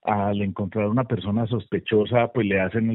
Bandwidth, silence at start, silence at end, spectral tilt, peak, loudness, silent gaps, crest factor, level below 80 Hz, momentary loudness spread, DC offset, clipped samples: 4.1 kHz; 0.05 s; 0 s; -6 dB/octave; -6 dBFS; -23 LUFS; none; 16 dB; -58 dBFS; 5 LU; under 0.1%; under 0.1%